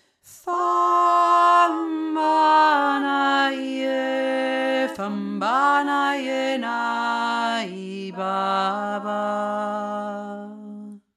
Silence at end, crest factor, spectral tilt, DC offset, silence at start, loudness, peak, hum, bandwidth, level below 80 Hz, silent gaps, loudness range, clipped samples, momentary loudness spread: 0.2 s; 16 dB; -4.5 dB/octave; under 0.1%; 0.25 s; -21 LUFS; -6 dBFS; none; 13.5 kHz; -78 dBFS; none; 7 LU; under 0.1%; 15 LU